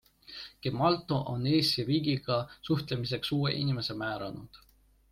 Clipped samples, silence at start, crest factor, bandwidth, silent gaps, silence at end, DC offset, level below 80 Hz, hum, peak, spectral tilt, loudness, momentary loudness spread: under 0.1%; 0.3 s; 18 dB; 15.5 kHz; none; 0.55 s; under 0.1%; -60 dBFS; none; -14 dBFS; -6.5 dB/octave; -30 LUFS; 14 LU